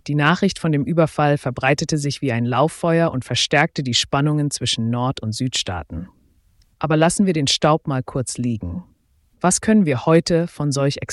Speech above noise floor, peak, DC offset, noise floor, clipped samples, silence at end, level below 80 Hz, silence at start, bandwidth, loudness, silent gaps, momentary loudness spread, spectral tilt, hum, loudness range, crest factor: 40 dB; -4 dBFS; under 0.1%; -59 dBFS; under 0.1%; 0 s; -48 dBFS; 0.05 s; 12 kHz; -19 LUFS; none; 8 LU; -5 dB/octave; none; 3 LU; 16 dB